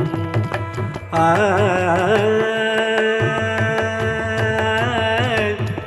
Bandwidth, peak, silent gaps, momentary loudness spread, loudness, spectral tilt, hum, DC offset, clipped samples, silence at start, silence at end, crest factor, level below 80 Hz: 12.5 kHz; -4 dBFS; none; 6 LU; -18 LUFS; -6 dB/octave; none; under 0.1%; under 0.1%; 0 s; 0 s; 14 dB; -46 dBFS